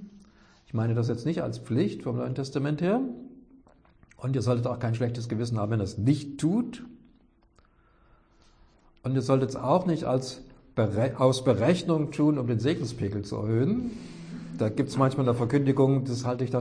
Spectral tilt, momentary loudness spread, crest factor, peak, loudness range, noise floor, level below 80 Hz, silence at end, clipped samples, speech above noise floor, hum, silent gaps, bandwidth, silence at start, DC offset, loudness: -7.5 dB/octave; 11 LU; 18 dB; -10 dBFS; 5 LU; -62 dBFS; -58 dBFS; 0 s; under 0.1%; 36 dB; none; none; 10.5 kHz; 0 s; under 0.1%; -27 LUFS